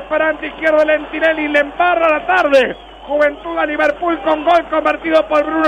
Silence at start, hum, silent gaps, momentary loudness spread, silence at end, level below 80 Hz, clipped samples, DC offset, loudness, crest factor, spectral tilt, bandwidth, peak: 0 s; none; none; 6 LU; 0 s; -44 dBFS; under 0.1%; under 0.1%; -15 LUFS; 12 dB; -4.5 dB/octave; 9.6 kHz; -2 dBFS